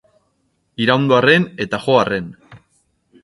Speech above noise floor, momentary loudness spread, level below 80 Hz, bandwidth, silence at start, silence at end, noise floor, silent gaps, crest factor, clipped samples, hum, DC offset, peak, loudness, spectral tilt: 50 dB; 14 LU; -54 dBFS; 11.5 kHz; 0.8 s; 0.65 s; -66 dBFS; none; 18 dB; under 0.1%; none; under 0.1%; 0 dBFS; -16 LUFS; -6 dB/octave